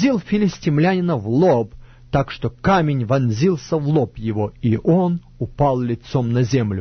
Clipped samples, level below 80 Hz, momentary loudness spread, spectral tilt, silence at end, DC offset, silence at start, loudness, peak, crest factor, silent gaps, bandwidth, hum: under 0.1%; -42 dBFS; 6 LU; -7.5 dB/octave; 0 s; under 0.1%; 0 s; -19 LUFS; -4 dBFS; 14 dB; none; 6.6 kHz; none